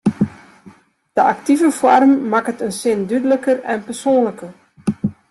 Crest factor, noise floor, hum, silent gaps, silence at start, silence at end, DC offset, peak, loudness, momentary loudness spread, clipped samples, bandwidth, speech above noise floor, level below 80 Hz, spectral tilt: 16 dB; -46 dBFS; none; none; 0.05 s; 0.2 s; under 0.1%; -2 dBFS; -17 LUFS; 12 LU; under 0.1%; 12.5 kHz; 31 dB; -56 dBFS; -6 dB/octave